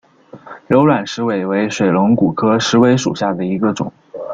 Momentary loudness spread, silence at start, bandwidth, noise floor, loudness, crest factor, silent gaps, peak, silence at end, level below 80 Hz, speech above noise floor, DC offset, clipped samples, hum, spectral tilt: 7 LU; 0.35 s; 7.8 kHz; -38 dBFS; -15 LUFS; 14 dB; none; -2 dBFS; 0 s; -52 dBFS; 24 dB; under 0.1%; under 0.1%; none; -6 dB/octave